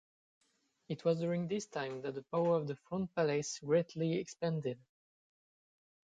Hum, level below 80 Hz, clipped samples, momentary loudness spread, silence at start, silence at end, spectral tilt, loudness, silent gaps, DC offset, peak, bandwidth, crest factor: none; -76 dBFS; under 0.1%; 8 LU; 0.9 s; 1.4 s; -6 dB/octave; -36 LUFS; none; under 0.1%; -20 dBFS; 9.2 kHz; 18 dB